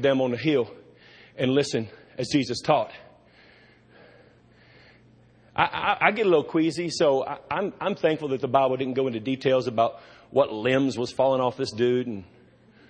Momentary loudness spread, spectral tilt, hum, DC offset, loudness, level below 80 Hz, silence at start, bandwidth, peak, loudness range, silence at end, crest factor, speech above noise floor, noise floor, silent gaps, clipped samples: 7 LU; -5.5 dB/octave; none; under 0.1%; -25 LUFS; -64 dBFS; 0 s; 9.8 kHz; -4 dBFS; 6 LU; 0.65 s; 22 dB; 32 dB; -56 dBFS; none; under 0.1%